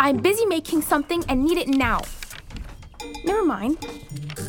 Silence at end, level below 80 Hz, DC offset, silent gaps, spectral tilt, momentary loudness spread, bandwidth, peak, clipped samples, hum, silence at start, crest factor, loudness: 0 s; -38 dBFS; under 0.1%; none; -4.5 dB/octave; 18 LU; over 20 kHz; -4 dBFS; under 0.1%; none; 0 s; 20 dB; -22 LUFS